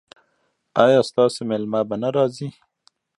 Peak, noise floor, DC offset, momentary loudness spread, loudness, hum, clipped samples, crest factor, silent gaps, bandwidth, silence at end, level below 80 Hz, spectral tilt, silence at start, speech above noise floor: 0 dBFS; -69 dBFS; under 0.1%; 10 LU; -20 LUFS; none; under 0.1%; 20 dB; none; 11.5 kHz; 0.7 s; -68 dBFS; -6 dB/octave; 0.75 s; 50 dB